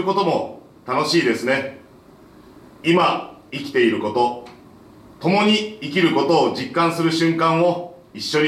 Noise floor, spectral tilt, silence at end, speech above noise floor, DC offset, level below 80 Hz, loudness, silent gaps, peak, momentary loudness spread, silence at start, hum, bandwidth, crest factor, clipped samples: -47 dBFS; -5 dB/octave; 0 s; 28 dB; under 0.1%; -62 dBFS; -19 LUFS; none; -4 dBFS; 13 LU; 0 s; none; 14 kHz; 16 dB; under 0.1%